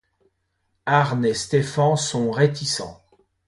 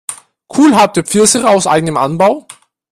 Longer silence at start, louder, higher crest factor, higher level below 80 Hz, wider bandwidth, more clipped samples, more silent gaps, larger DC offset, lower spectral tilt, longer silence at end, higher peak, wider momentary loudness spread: first, 0.85 s vs 0.1 s; second, -21 LUFS vs -10 LUFS; first, 20 dB vs 12 dB; second, -58 dBFS vs -50 dBFS; second, 11.5 kHz vs 15.5 kHz; neither; neither; neither; about the same, -5 dB/octave vs -4 dB/octave; about the same, 0.55 s vs 0.5 s; second, -4 dBFS vs 0 dBFS; second, 7 LU vs 11 LU